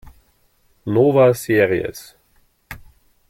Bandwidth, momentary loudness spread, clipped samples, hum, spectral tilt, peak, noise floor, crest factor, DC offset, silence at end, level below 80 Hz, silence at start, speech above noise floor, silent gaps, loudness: 16.5 kHz; 25 LU; under 0.1%; none; -6.5 dB/octave; -2 dBFS; -59 dBFS; 18 dB; under 0.1%; 0.5 s; -50 dBFS; 0.05 s; 43 dB; none; -17 LUFS